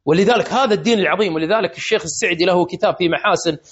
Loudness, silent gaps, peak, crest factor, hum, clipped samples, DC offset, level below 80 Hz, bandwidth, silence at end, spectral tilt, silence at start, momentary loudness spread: -17 LUFS; none; -4 dBFS; 14 dB; none; under 0.1%; under 0.1%; -56 dBFS; 8 kHz; 0.15 s; -3 dB/octave; 0.05 s; 4 LU